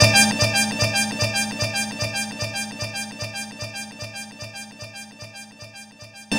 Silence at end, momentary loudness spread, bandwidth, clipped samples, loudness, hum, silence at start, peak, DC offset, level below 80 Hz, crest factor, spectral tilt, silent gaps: 0 s; 20 LU; 16.5 kHz; under 0.1%; -22 LUFS; none; 0 s; 0 dBFS; under 0.1%; -48 dBFS; 24 dB; -2.5 dB/octave; none